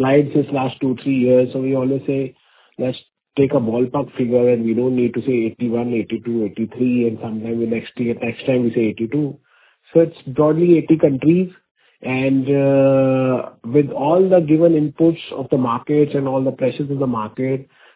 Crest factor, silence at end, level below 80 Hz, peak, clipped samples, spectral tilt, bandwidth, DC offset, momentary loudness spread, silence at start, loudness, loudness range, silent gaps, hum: 18 dB; 0.35 s; -58 dBFS; 0 dBFS; under 0.1%; -12 dB/octave; 4 kHz; under 0.1%; 10 LU; 0 s; -18 LUFS; 5 LU; 11.71-11.75 s; none